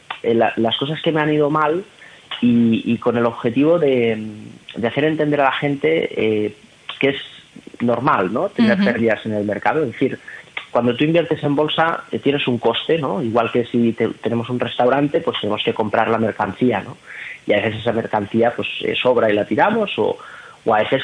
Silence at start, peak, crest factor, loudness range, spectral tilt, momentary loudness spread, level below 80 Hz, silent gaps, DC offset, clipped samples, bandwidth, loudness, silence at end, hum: 0.1 s; 0 dBFS; 18 dB; 2 LU; -7 dB/octave; 10 LU; -58 dBFS; none; under 0.1%; under 0.1%; 10 kHz; -18 LUFS; 0 s; none